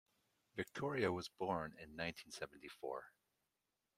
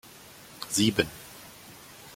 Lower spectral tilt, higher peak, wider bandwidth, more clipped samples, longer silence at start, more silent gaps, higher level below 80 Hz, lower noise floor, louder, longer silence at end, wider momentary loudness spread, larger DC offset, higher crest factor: first, -5 dB/octave vs -3.5 dB/octave; second, -22 dBFS vs -6 dBFS; about the same, 16 kHz vs 16.5 kHz; neither; first, 0.55 s vs 0.05 s; neither; second, -76 dBFS vs -60 dBFS; first, -89 dBFS vs -50 dBFS; second, -45 LUFS vs -27 LUFS; first, 0.9 s vs 0 s; second, 11 LU vs 23 LU; neither; about the same, 24 dB vs 26 dB